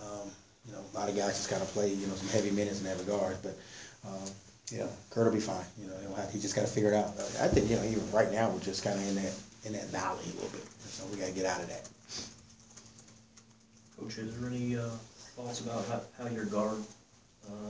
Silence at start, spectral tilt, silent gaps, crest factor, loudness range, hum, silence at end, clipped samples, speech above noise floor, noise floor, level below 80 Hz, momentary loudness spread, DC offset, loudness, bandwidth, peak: 0 s; -5 dB/octave; none; 22 dB; 10 LU; none; 0 s; under 0.1%; 27 dB; -61 dBFS; -56 dBFS; 17 LU; under 0.1%; -35 LUFS; 8 kHz; -12 dBFS